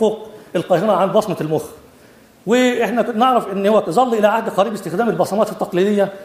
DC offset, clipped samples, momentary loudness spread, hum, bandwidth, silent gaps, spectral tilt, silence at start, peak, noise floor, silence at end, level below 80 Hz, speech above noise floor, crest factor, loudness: under 0.1%; under 0.1%; 8 LU; none; 15.5 kHz; none; -5.5 dB/octave; 0 s; 0 dBFS; -47 dBFS; 0 s; -60 dBFS; 30 dB; 16 dB; -17 LUFS